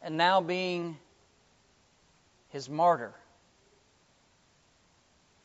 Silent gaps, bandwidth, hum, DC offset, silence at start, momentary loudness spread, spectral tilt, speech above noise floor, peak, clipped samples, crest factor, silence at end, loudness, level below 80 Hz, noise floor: none; 8 kHz; none; under 0.1%; 0 s; 19 LU; -2.5 dB/octave; 38 dB; -10 dBFS; under 0.1%; 22 dB; 2.35 s; -29 LUFS; -78 dBFS; -66 dBFS